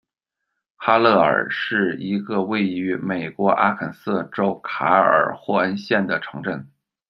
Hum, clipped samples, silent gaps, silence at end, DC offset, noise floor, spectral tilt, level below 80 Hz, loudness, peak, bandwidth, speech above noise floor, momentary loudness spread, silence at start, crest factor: none; under 0.1%; none; 0.45 s; under 0.1%; -81 dBFS; -7.5 dB/octave; -66 dBFS; -20 LUFS; -2 dBFS; 6.2 kHz; 61 dB; 11 LU; 0.8 s; 20 dB